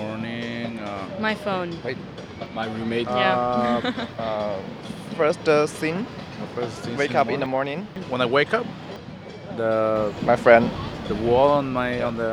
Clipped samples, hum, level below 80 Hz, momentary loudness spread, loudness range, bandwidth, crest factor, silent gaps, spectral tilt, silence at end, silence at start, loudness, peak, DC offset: under 0.1%; none; -50 dBFS; 15 LU; 4 LU; 12.5 kHz; 24 dB; none; -6 dB/octave; 0 s; 0 s; -23 LUFS; 0 dBFS; under 0.1%